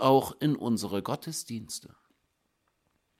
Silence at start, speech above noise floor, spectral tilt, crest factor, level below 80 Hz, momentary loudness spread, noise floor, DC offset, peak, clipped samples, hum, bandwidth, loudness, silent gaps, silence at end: 0 s; 48 dB; -5.5 dB/octave; 22 dB; -68 dBFS; 13 LU; -76 dBFS; under 0.1%; -8 dBFS; under 0.1%; none; 16.5 kHz; -31 LUFS; none; 1.35 s